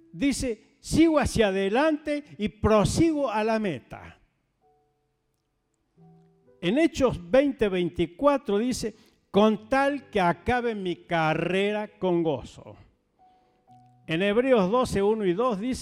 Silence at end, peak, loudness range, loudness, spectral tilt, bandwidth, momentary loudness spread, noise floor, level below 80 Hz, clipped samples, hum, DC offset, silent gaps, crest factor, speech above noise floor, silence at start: 0 s; -10 dBFS; 6 LU; -25 LUFS; -5.5 dB/octave; 15 kHz; 10 LU; -75 dBFS; -46 dBFS; under 0.1%; none; under 0.1%; none; 16 dB; 50 dB; 0.15 s